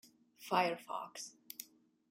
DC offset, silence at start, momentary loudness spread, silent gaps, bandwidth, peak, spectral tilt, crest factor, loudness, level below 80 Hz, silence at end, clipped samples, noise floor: under 0.1%; 0.05 s; 18 LU; none; 16.5 kHz; -18 dBFS; -3 dB/octave; 24 dB; -40 LUFS; -88 dBFS; 0.45 s; under 0.1%; -60 dBFS